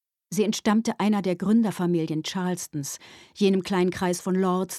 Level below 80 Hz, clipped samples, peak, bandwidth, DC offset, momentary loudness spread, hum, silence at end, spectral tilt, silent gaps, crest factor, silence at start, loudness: -64 dBFS; under 0.1%; -10 dBFS; 14.5 kHz; under 0.1%; 10 LU; none; 0 s; -5.5 dB/octave; none; 14 dB; 0.3 s; -25 LUFS